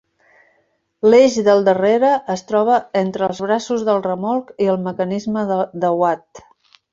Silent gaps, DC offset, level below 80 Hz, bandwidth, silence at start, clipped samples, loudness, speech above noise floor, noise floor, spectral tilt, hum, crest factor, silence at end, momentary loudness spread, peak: none; under 0.1%; -60 dBFS; 7.8 kHz; 1.05 s; under 0.1%; -17 LUFS; 48 dB; -64 dBFS; -6 dB/octave; none; 16 dB; 0.55 s; 9 LU; -2 dBFS